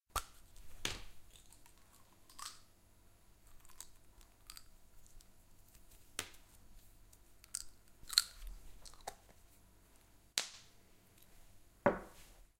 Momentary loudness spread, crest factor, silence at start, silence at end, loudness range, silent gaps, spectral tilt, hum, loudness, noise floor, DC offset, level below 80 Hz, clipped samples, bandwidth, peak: 28 LU; 42 dB; 0.1 s; 0.15 s; 16 LU; none; -1.5 dB/octave; none; -41 LUFS; -65 dBFS; under 0.1%; -60 dBFS; under 0.1%; 16.5 kHz; -6 dBFS